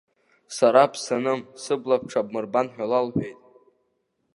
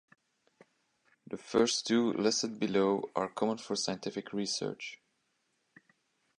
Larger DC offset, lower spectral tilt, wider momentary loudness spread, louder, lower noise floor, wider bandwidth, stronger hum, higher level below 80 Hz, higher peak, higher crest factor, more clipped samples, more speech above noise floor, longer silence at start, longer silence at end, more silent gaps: neither; first, -5 dB/octave vs -3.5 dB/octave; about the same, 11 LU vs 11 LU; first, -23 LUFS vs -32 LUFS; second, -73 dBFS vs -78 dBFS; about the same, 11.5 kHz vs 11 kHz; neither; first, -66 dBFS vs -74 dBFS; first, -2 dBFS vs -14 dBFS; about the same, 22 dB vs 20 dB; neither; first, 50 dB vs 46 dB; second, 0.5 s vs 1.3 s; second, 1.05 s vs 1.45 s; neither